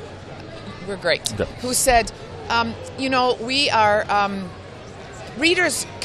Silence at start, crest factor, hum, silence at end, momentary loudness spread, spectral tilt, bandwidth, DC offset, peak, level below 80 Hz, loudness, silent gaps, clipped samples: 0 s; 22 dB; none; 0 s; 20 LU; -2.5 dB/octave; 14.5 kHz; under 0.1%; 0 dBFS; -42 dBFS; -20 LUFS; none; under 0.1%